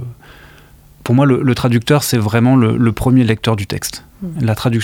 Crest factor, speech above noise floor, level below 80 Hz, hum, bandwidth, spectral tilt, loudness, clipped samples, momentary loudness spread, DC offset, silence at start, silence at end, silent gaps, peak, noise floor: 14 dB; 30 dB; -40 dBFS; none; 17.5 kHz; -6 dB/octave; -14 LUFS; under 0.1%; 13 LU; under 0.1%; 0 s; 0 s; none; 0 dBFS; -43 dBFS